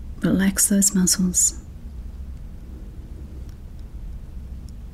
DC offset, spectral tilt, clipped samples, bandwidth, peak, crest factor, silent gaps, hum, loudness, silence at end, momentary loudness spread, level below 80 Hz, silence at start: under 0.1%; -3.5 dB/octave; under 0.1%; 16 kHz; -4 dBFS; 20 dB; none; none; -18 LUFS; 0 s; 23 LU; -36 dBFS; 0 s